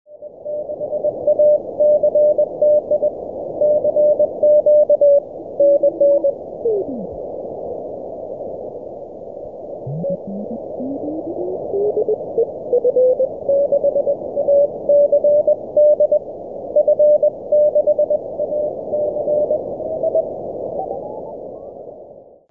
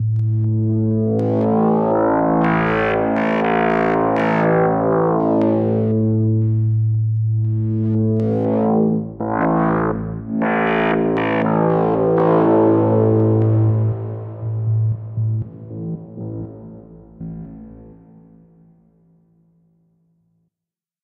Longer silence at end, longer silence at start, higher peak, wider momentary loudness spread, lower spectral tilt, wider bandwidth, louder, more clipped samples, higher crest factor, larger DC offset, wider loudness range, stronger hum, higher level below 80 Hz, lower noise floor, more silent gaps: second, 0.3 s vs 3.1 s; about the same, 0.1 s vs 0 s; about the same, -6 dBFS vs -4 dBFS; first, 17 LU vs 14 LU; first, -12.5 dB/octave vs -10.5 dB/octave; second, 1.1 kHz vs 4.2 kHz; about the same, -17 LUFS vs -18 LUFS; neither; about the same, 12 dB vs 14 dB; first, 0.2% vs under 0.1%; about the same, 12 LU vs 11 LU; neither; second, -56 dBFS vs -46 dBFS; second, -41 dBFS vs -87 dBFS; neither